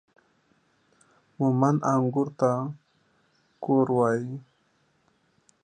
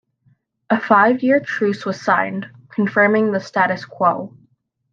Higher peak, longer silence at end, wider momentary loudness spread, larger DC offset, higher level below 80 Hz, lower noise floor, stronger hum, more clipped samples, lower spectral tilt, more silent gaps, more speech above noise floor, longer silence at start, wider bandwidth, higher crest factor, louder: second, -8 dBFS vs -2 dBFS; first, 1.25 s vs 0.65 s; first, 15 LU vs 12 LU; neither; about the same, -72 dBFS vs -68 dBFS; first, -68 dBFS vs -61 dBFS; neither; neither; first, -9 dB/octave vs -6.5 dB/octave; neither; about the same, 44 dB vs 43 dB; first, 1.4 s vs 0.7 s; first, 9.4 kHz vs 7.4 kHz; about the same, 20 dB vs 18 dB; second, -25 LUFS vs -18 LUFS